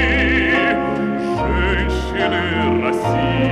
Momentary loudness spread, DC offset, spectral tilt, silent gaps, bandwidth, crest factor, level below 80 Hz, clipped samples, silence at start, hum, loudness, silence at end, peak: 5 LU; under 0.1%; -6.5 dB/octave; none; 12.5 kHz; 14 dB; -26 dBFS; under 0.1%; 0 s; none; -18 LUFS; 0 s; -4 dBFS